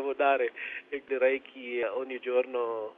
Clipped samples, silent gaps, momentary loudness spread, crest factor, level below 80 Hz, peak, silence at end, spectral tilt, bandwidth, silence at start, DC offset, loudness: under 0.1%; none; 10 LU; 16 dB; -78 dBFS; -14 dBFS; 0.05 s; -5.5 dB/octave; 3.8 kHz; 0 s; under 0.1%; -30 LUFS